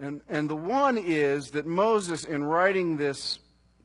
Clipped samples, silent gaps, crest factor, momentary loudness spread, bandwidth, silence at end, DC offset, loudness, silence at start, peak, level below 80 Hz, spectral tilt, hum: under 0.1%; none; 18 dB; 8 LU; 11 kHz; 0.45 s; under 0.1%; -27 LUFS; 0 s; -10 dBFS; -64 dBFS; -5 dB/octave; none